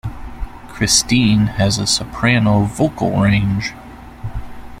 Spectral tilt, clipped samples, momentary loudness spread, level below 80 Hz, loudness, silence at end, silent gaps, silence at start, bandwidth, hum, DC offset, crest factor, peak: -4.5 dB/octave; under 0.1%; 19 LU; -34 dBFS; -15 LUFS; 0 s; none; 0.05 s; 15.5 kHz; none; under 0.1%; 16 dB; 0 dBFS